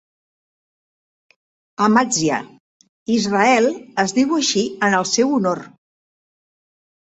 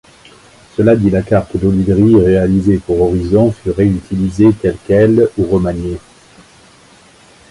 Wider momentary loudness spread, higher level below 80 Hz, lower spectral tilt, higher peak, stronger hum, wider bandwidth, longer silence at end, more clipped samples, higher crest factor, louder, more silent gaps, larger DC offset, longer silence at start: about the same, 8 LU vs 9 LU; second, -62 dBFS vs -32 dBFS; second, -3.5 dB/octave vs -9 dB/octave; about the same, -2 dBFS vs 0 dBFS; neither; second, 8.4 kHz vs 11.5 kHz; second, 1.35 s vs 1.55 s; neither; first, 18 dB vs 12 dB; second, -18 LUFS vs -12 LUFS; first, 2.60-2.80 s, 2.89-3.06 s vs none; neither; first, 1.8 s vs 0.8 s